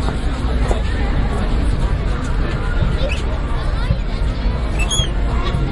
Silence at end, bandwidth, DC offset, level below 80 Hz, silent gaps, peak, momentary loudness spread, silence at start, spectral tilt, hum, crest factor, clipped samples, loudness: 0 s; 11.5 kHz; under 0.1%; -18 dBFS; none; -2 dBFS; 4 LU; 0 s; -5.5 dB/octave; none; 14 dB; under 0.1%; -20 LUFS